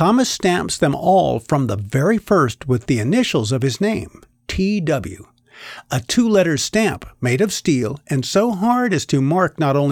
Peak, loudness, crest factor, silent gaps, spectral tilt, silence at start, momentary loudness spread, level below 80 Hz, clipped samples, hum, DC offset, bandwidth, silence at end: -6 dBFS; -18 LUFS; 12 dB; none; -5.5 dB/octave; 0 s; 9 LU; -44 dBFS; under 0.1%; none; under 0.1%; 17.5 kHz; 0 s